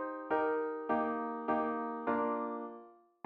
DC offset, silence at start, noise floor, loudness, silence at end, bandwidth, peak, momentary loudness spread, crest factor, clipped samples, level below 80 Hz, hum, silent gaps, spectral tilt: under 0.1%; 0 s; -56 dBFS; -35 LUFS; 0.35 s; 4.7 kHz; -20 dBFS; 8 LU; 16 dB; under 0.1%; -76 dBFS; none; none; -4.5 dB/octave